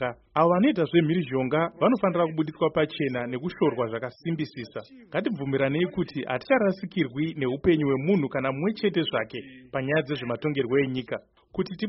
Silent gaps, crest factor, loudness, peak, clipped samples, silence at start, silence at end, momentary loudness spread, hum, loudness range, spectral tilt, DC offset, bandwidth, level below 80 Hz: none; 18 dB; -26 LUFS; -8 dBFS; under 0.1%; 0 s; 0 s; 10 LU; none; 4 LU; -5.5 dB/octave; under 0.1%; 5.8 kHz; -58 dBFS